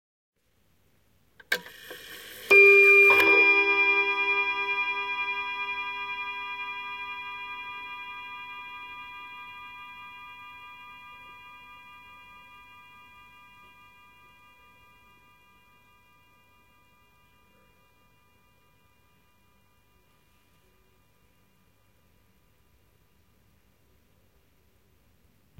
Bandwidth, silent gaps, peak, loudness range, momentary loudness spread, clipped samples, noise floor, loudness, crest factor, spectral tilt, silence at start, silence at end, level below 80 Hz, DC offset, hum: 16.5 kHz; none; -8 dBFS; 26 LU; 29 LU; under 0.1%; -69 dBFS; -21 LUFS; 22 dB; -2.5 dB/octave; 1.5 s; 14.25 s; -70 dBFS; under 0.1%; 50 Hz at -70 dBFS